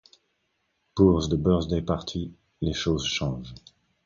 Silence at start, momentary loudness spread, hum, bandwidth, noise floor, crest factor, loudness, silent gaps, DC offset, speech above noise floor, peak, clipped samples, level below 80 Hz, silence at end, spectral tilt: 0.95 s; 16 LU; none; 7.4 kHz; -74 dBFS; 20 dB; -25 LUFS; none; under 0.1%; 50 dB; -6 dBFS; under 0.1%; -40 dBFS; 0.45 s; -6 dB/octave